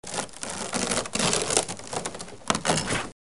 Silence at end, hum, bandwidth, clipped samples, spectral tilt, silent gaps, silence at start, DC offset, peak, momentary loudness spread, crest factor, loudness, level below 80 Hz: 0.2 s; none; 11.5 kHz; under 0.1%; -2.5 dB/octave; none; 0 s; 0.5%; -2 dBFS; 9 LU; 26 dB; -27 LUFS; -52 dBFS